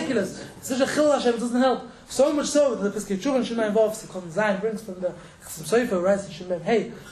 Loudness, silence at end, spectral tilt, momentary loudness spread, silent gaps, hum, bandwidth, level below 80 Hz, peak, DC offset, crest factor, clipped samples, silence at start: -24 LUFS; 0 s; -4.5 dB/octave; 11 LU; none; none; 13.5 kHz; -58 dBFS; -8 dBFS; under 0.1%; 16 dB; under 0.1%; 0 s